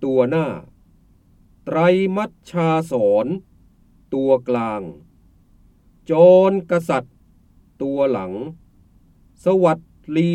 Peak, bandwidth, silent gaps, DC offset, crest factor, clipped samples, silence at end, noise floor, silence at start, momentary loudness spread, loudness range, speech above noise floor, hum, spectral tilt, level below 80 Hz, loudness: -2 dBFS; 11.5 kHz; none; under 0.1%; 18 dB; under 0.1%; 0 s; -53 dBFS; 0 s; 16 LU; 5 LU; 36 dB; none; -8 dB/octave; -56 dBFS; -19 LUFS